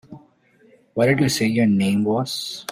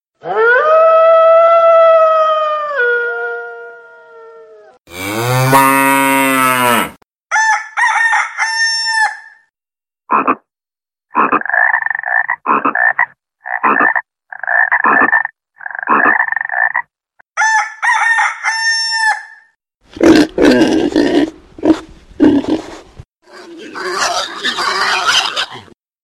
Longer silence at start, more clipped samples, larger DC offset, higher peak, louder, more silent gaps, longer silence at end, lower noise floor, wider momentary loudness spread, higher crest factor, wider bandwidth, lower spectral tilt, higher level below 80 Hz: second, 0.1 s vs 0.25 s; neither; neither; second, -6 dBFS vs 0 dBFS; second, -20 LUFS vs -12 LUFS; neither; second, 0 s vs 0.4 s; second, -56 dBFS vs under -90 dBFS; second, 8 LU vs 14 LU; about the same, 16 dB vs 14 dB; about the same, 16 kHz vs 16 kHz; first, -5.5 dB/octave vs -3.5 dB/octave; second, -56 dBFS vs -48 dBFS